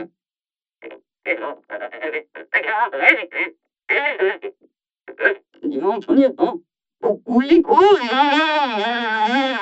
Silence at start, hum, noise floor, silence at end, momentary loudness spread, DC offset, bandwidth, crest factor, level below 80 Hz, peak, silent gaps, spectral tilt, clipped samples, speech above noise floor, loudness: 0 s; none; under -90 dBFS; 0 s; 16 LU; under 0.1%; 8 kHz; 20 dB; -62 dBFS; 0 dBFS; none; -4.5 dB/octave; under 0.1%; over 72 dB; -18 LUFS